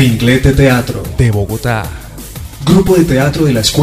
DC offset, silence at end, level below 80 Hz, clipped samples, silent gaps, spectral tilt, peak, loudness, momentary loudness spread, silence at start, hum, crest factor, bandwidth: under 0.1%; 0 s; -24 dBFS; 0.3%; none; -5.5 dB/octave; 0 dBFS; -11 LUFS; 17 LU; 0 s; none; 10 dB; 16 kHz